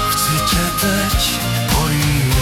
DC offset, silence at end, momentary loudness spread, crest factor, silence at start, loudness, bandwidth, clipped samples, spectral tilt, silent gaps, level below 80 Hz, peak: under 0.1%; 0 s; 1 LU; 12 dB; 0 s; -16 LUFS; 18 kHz; under 0.1%; -3.5 dB/octave; none; -26 dBFS; -4 dBFS